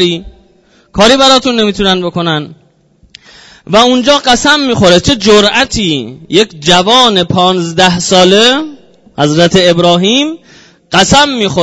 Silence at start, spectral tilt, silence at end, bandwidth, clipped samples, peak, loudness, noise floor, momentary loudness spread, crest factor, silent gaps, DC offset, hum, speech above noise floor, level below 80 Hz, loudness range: 0 s; -4 dB/octave; 0 s; 11 kHz; 2%; 0 dBFS; -7 LUFS; -47 dBFS; 9 LU; 8 dB; none; under 0.1%; none; 39 dB; -36 dBFS; 3 LU